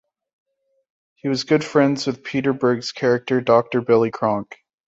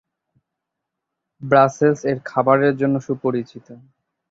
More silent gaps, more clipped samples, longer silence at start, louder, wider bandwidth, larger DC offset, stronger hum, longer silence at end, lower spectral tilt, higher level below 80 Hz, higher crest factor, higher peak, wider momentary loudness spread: neither; neither; second, 1.25 s vs 1.4 s; about the same, -20 LUFS vs -18 LUFS; about the same, 8 kHz vs 7.8 kHz; neither; neither; second, 0.35 s vs 0.55 s; second, -6 dB/octave vs -7.5 dB/octave; about the same, -62 dBFS vs -62 dBFS; about the same, 18 dB vs 18 dB; about the same, -2 dBFS vs -2 dBFS; second, 7 LU vs 11 LU